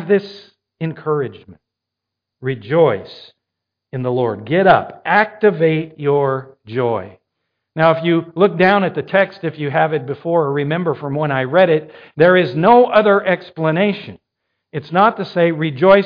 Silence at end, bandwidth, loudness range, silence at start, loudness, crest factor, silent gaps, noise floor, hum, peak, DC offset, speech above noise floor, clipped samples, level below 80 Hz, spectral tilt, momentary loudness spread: 0 s; 5.2 kHz; 7 LU; 0 s; -16 LUFS; 16 dB; none; -81 dBFS; none; 0 dBFS; under 0.1%; 66 dB; under 0.1%; -58 dBFS; -9 dB/octave; 14 LU